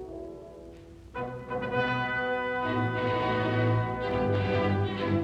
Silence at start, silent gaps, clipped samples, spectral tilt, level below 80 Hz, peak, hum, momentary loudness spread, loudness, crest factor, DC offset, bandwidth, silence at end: 0 s; none; under 0.1%; -8 dB/octave; -52 dBFS; -16 dBFS; none; 17 LU; -29 LUFS; 14 dB; under 0.1%; 7.2 kHz; 0 s